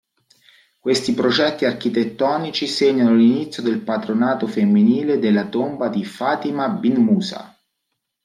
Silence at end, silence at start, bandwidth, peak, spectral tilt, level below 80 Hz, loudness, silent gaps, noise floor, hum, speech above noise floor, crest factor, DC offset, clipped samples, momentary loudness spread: 0.8 s; 0.85 s; 11 kHz; -4 dBFS; -6 dB/octave; -64 dBFS; -19 LUFS; none; -76 dBFS; none; 58 dB; 14 dB; under 0.1%; under 0.1%; 8 LU